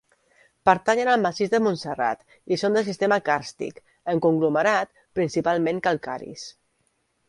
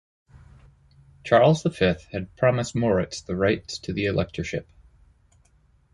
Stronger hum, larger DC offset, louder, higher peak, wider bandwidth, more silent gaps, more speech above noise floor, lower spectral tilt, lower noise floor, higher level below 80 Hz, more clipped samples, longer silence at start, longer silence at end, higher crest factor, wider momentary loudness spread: neither; neither; about the same, -23 LUFS vs -24 LUFS; first, -2 dBFS vs -6 dBFS; about the same, 11.5 kHz vs 11.5 kHz; neither; first, 48 dB vs 38 dB; about the same, -5.5 dB/octave vs -6 dB/octave; first, -70 dBFS vs -61 dBFS; second, -62 dBFS vs -48 dBFS; neither; second, 0.65 s vs 1.25 s; second, 0.8 s vs 1.3 s; about the same, 22 dB vs 20 dB; about the same, 14 LU vs 13 LU